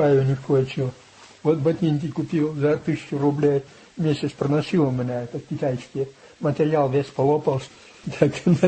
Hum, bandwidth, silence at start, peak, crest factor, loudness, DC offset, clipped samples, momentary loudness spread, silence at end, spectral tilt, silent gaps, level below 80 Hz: none; 8.6 kHz; 0 s; -4 dBFS; 18 dB; -23 LUFS; under 0.1%; under 0.1%; 10 LU; 0 s; -8 dB/octave; none; -58 dBFS